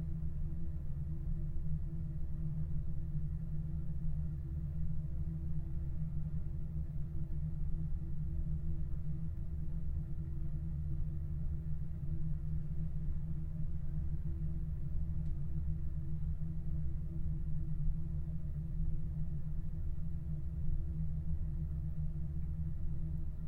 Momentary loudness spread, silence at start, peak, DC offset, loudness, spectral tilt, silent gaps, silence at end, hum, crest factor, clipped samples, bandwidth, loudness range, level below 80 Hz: 2 LU; 0 s; -22 dBFS; under 0.1%; -42 LUFS; -11 dB/octave; none; 0 s; none; 14 dB; under 0.1%; 2 kHz; 1 LU; -40 dBFS